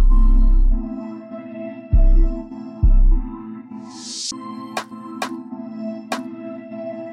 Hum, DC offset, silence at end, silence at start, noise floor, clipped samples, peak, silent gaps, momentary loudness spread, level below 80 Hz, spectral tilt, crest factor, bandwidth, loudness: none; under 0.1%; 0 s; 0 s; -35 dBFS; under 0.1%; -6 dBFS; none; 15 LU; -18 dBFS; -5.5 dB/octave; 12 dB; 9.2 kHz; -24 LUFS